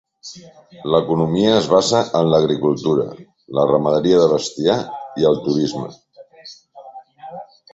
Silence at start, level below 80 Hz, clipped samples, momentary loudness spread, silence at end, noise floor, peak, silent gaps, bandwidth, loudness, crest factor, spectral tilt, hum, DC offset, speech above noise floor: 0.25 s; -54 dBFS; under 0.1%; 22 LU; 0.3 s; -43 dBFS; -2 dBFS; none; 8.2 kHz; -17 LUFS; 16 dB; -6 dB/octave; none; under 0.1%; 26 dB